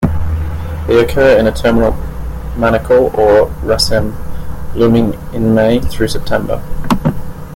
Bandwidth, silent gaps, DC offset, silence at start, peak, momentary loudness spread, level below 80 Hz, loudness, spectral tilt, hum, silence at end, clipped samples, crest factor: 17 kHz; none; under 0.1%; 0 s; 0 dBFS; 14 LU; -24 dBFS; -13 LUFS; -6 dB/octave; none; 0 s; under 0.1%; 12 dB